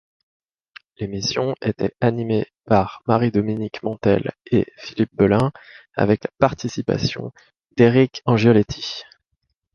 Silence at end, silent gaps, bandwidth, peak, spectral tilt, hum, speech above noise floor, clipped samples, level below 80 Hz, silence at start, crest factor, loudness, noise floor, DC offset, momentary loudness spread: 0.7 s; none; 7 kHz; -2 dBFS; -6.5 dB/octave; none; 55 dB; under 0.1%; -48 dBFS; 1 s; 18 dB; -20 LUFS; -74 dBFS; under 0.1%; 13 LU